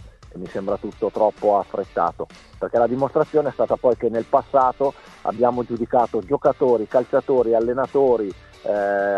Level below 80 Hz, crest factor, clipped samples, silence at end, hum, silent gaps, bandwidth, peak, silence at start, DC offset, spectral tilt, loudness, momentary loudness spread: -50 dBFS; 18 dB; under 0.1%; 0 s; none; none; 8.8 kHz; -2 dBFS; 0 s; under 0.1%; -8 dB/octave; -21 LUFS; 11 LU